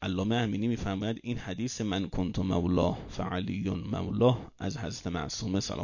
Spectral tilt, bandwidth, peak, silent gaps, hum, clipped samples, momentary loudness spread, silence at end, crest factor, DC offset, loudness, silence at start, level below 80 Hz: -6 dB/octave; 7.4 kHz; -12 dBFS; none; none; under 0.1%; 9 LU; 0 s; 18 dB; under 0.1%; -31 LUFS; 0 s; -46 dBFS